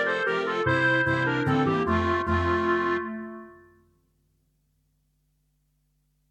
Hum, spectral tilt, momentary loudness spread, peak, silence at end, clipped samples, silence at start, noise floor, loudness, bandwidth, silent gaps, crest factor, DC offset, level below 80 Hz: 50 Hz at -70 dBFS; -7 dB/octave; 11 LU; -10 dBFS; 2.75 s; under 0.1%; 0 s; -70 dBFS; -24 LUFS; 8.8 kHz; none; 16 dB; under 0.1%; -48 dBFS